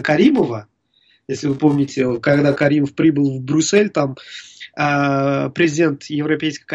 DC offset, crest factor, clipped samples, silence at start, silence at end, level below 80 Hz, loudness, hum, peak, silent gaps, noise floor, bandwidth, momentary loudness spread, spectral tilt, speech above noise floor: under 0.1%; 14 dB; under 0.1%; 0 s; 0 s; -56 dBFS; -17 LUFS; none; -2 dBFS; none; -59 dBFS; 8.2 kHz; 10 LU; -5.5 dB/octave; 42 dB